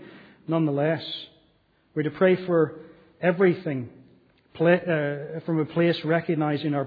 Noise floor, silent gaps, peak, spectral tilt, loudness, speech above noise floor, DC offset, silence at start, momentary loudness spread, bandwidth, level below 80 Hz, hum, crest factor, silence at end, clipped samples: -64 dBFS; none; -8 dBFS; -9.5 dB/octave; -25 LUFS; 40 dB; under 0.1%; 0 s; 13 LU; 5 kHz; -70 dBFS; none; 18 dB; 0 s; under 0.1%